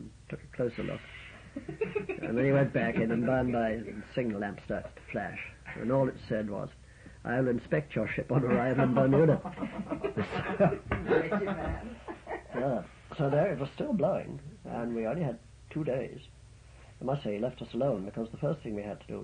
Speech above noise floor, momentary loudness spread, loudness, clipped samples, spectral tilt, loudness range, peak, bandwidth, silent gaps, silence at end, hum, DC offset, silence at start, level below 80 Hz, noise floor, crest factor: 22 dB; 15 LU; -32 LUFS; under 0.1%; -8.5 dB/octave; 7 LU; -14 dBFS; 10 kHz; none; 0 s; none; under 0.1%; 0 s; -52 dBFS; -53 dBFS; 18 dB